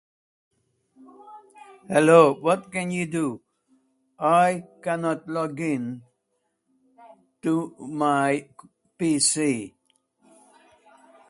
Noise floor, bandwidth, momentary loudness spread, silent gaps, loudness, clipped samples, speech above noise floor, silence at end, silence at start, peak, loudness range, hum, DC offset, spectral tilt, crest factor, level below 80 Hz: -75 dBFS; 11.5 kHz; 15 LU; none; -23 LUFS; under 0.1%; 53 dB; 1.6 s; 1.25 s; -2 dBFS; 7 LU; none; under 0.1%; -4.5 dB/octave; 24 dB; -70 dBFS